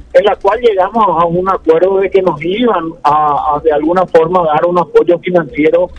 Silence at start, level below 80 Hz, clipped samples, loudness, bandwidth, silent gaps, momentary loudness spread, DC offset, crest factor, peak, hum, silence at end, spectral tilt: 0.15 s; -40 dBFS; 0.9%; -11 LUFS; 8.2 kHz; none; 3 LU; under 0.1%; 10 dB; 0 dBFS; none; 0 s; -7.5 dB/octave